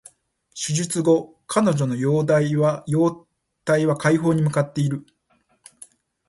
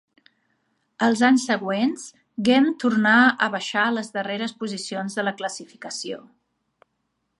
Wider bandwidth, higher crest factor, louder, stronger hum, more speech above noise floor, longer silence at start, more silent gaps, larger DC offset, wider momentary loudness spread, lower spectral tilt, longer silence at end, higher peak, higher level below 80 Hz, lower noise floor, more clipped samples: about the same, 11.5 kHz vs 11 kHz; about the same, 18 dB vs 18 dB; about the same, -21 LUFS vs -22 LUFS; neither; second, 45 dB vs 53 dB; second, 0.55 s vs 1 s; neither; neither; second, 7 LU vs 16 LU; first, -6 dB/octave vs -4 dB/octave; about the same, 1.3 s vs 1.2 s; about the same, -2 dBFS vs -4 dBFS; first, -62 dBFS vs -72 dBFS; second, -65 dBFS vs -75 dBFS; neither